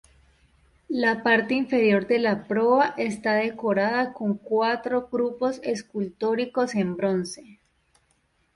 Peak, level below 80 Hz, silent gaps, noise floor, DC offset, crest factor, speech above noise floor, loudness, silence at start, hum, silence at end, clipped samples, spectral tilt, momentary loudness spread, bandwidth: -8 dBFS; -64 dBFS; none; -68 dBFS; under 0.1%; 18 dB; 44 dB; -24 LUFS; 0.9 s; none; 1 s; under 0.1%; -5.5 dB/octave; 9 LU; 11.5 kHz